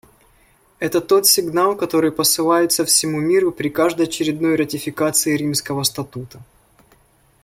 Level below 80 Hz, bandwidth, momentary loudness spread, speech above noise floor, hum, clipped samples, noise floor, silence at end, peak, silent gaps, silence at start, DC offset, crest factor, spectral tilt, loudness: -56 dBFS; 16.5 kHz; 8 LU; 37 dB; none; under 0.1%; -55 dBFS; 1 s; 0 dBFS; none; 0.8 s; under 0.1%; 18 dB; -3 dB/octave; -17 LUFS